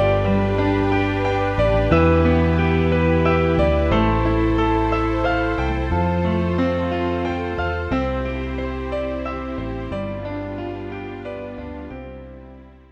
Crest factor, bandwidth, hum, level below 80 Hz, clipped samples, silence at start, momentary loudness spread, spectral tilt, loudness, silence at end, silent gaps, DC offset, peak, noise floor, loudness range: 16 dB; 7.4 kHz; none; -30 dBFS; under 0.1%; 0 s; 14 LU; -8.5 dB/octave; -20 LUFS; 0.2 s; none; under 0.1%; -4 dBFS; -42 dBFS; 11 LU